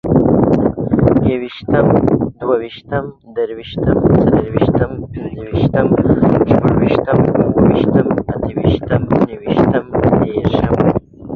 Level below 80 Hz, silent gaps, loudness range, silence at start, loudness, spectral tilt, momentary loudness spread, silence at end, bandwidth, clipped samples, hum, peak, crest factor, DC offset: -32 dBFS; none; 3 LU; 0.05 s; -14 LUFS; -10.5 dB/octave; 10 LU; 0 s; 5.8 kHz; under 0.1%; none; 0 dBFS; 14 dB; under 0.1%